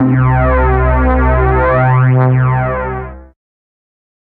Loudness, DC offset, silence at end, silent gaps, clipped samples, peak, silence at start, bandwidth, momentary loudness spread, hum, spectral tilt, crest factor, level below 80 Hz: -12 LUFS; under 0.1%; 1.1 s; none; under 0.1%; 0 dBFS; 0 s; 3.5 kHz; 9 LU; none; -12.5 dB/octave; 12 dB; -18 dBFS